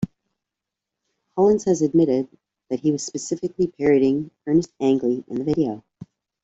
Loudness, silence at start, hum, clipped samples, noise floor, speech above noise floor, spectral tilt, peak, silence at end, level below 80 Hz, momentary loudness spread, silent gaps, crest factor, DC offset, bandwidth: -22 LUFS; 0 s; none; under 0.1%; -86 dBFS; 65 dB; -6.5 dB/octave; -6 dBFS; 0.4 s; -58 dBFS; 10 LU; none; 16 dB; under 0.1%; 8 kHz